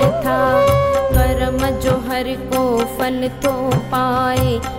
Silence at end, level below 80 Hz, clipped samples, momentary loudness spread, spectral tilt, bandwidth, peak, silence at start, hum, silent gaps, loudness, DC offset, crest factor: 0 s; -28 dBFS; under 0.1%; 6 LU; -6 dB/octave; 16 kHz; -2 dBFS; 0 s; none; none; -17 LUFS; under 0.1%; 14 dB